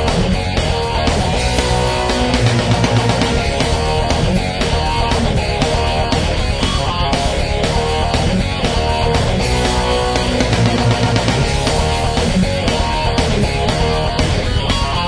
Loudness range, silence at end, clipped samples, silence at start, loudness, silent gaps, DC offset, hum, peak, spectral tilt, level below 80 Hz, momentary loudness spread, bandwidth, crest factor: 1 LU; 0 s; under 0.1%; 0 s; -16 LUFS; none; under 0.1%; none; 0 dBFS; -5 dB/octave; -22 dBFS; 3 LU; 11 kHz; 14 dB